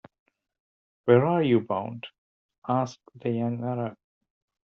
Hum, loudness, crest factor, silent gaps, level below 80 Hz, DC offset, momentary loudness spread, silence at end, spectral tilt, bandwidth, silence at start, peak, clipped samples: none; -26 LUFS; 22 dB; 2.18-2.49 s, 2.58-2.62 s; -72 dBFS; under 0.1%; 17 LU; 0.75 s; -7 dB/octave; 6.8 kHz; 1.05 s; -6 dBFS; under 0.1%